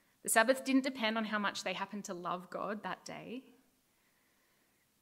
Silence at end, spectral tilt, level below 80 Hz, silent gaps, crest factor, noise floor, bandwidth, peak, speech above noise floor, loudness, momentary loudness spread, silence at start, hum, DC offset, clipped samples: 1.6 s; -3 dB/octave; -86 dBFS; none; 26 dB; -74 dBFS; 16 kHz; -12 dBFS; 38 dB; -35 LUFS; 16 LU; 0.25 s; none; under 0.1%; under 0.1%